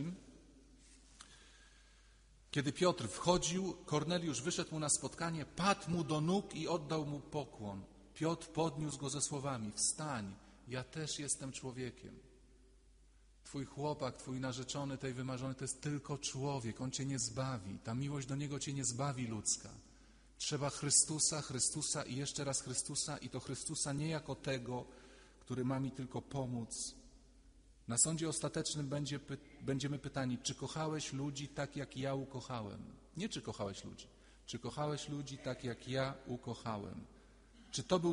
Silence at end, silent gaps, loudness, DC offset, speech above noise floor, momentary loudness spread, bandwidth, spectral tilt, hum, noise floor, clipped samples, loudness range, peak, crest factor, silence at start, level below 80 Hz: 0 s; none; -39 LUFS; under 0.1%; 25 dB; 12 LU; 10.5 kHz; -4 dB/octave; none; -65 dBFS; under 0.1%; 9 LU; -18 dBFS; 24 dB; 0 s; -64 dBFS